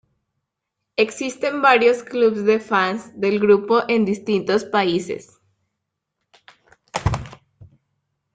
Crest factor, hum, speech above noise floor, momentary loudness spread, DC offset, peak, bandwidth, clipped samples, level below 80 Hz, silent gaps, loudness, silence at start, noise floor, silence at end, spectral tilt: 18 dB; none; 62 dB; 13 LU; under 0.1%; -2 dBFS; 9.2 kHz; under 0.1%; -46 dBFS; none; -19 LUFS; 1 s; -80 dBFS; 0.7 s; -5.5 dB/octave